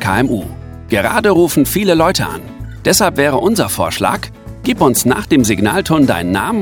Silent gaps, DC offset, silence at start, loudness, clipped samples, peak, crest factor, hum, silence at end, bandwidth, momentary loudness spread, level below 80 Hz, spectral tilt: none; under 0.1%; 0 s; -13 LUFS; under 0.1%; 0 dBFS; 14 dB; none; 0 s; 19.5 kHz; 11 LU; -36 dBFS; -4.5 dB/octave